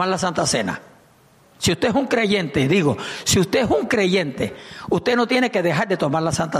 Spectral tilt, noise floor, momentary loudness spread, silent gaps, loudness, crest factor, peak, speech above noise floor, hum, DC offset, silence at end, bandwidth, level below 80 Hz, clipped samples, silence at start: -4.5 dB/octave; -53 dBFS; 7 LU; none; -20 LUFS; 14 dB; -6 dBFS; 33 dB; none; under 0.1%; 0 s; 15 kHz; -48 dBFS; under 0.1%; 0 s